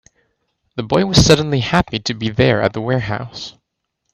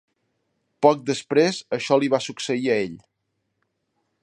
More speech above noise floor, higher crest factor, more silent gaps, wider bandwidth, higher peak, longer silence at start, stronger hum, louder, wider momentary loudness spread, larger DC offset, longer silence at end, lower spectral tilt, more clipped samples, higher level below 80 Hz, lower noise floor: first, 59 dB vs 55 dB; about the same, 18 dB vs 22 dB; neither; first, 15 kHz vs 11 kHz; about the same, 0 dBFS vs -2 dBFS; about the same, 0.75 s vs 0.8 s; neither; first, -16 LUFS vs -22 LUFS; first, 18 LU vs 7 LU; neither; second, 0.65 s vs 1.25 s; about the same, -5 dB/octave vs -4.5 dB/octave; neither; first, -36 dBFS vs -70 dBFS; about the same, -74 dBFS vs -76 dBFS